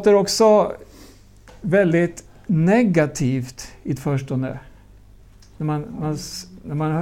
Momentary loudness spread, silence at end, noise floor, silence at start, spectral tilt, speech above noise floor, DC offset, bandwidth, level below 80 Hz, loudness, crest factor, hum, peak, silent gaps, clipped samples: 18 LU; 0 s; -46 dBFS; 0 s; -6 dB/octave; 27 dB; under 0.1%; 16 kHz; -48 dBFS; -20 LUFS; 16 dB; none; -4 dBFS; none; under 0.1%